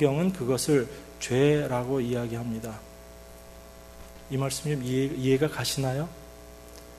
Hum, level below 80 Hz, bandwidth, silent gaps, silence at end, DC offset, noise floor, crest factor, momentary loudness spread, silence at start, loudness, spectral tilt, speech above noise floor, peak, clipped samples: 60 Hz at -50 dBFS; -52 dBFS; 13 kHz; none; 0 s; under 0.1%; -47 dBFS; 20 dB; 23 LU; 0 s; -28 LUFS; -5.5 dB/octave; 20 dB; -8 dBFS; under 0.1%